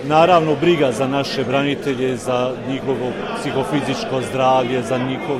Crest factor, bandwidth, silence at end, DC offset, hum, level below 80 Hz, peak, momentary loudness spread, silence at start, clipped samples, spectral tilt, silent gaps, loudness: 16 dB; 14.5 kHz; 0 s; under 0.1%; none; -50 dBFS; -2 dBFS; 8 LU; 0 s; under 0.1%; -5.5 dB/octave; none; -18 LUFS